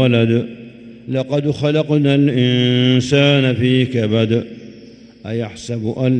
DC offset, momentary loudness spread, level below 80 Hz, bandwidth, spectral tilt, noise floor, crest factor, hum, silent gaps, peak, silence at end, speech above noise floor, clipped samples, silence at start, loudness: under 0.1%; 16 LU; -52 dBFS; 9 kHz; -7 dB/octave; -40 dBFS; 16 dB; none; none; 0 dBFS; 0 s; 25 dB; under 0.1%; 0 s; -16 LUFS